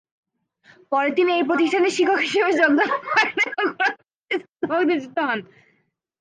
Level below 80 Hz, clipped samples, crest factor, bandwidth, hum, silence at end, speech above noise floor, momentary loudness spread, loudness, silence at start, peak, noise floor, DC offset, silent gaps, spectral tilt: -76 dBFS; under 0.1%; 16 dB; 9.6 kHz; none; 0.75 s; 48 dB; 9 LU; -20 LUFS; 0.9 s; -6 dBFS; -68 dBFS; under 0.1%; 4.15-4.22 s, 4.52-4.56 s; -3.5 dB/octave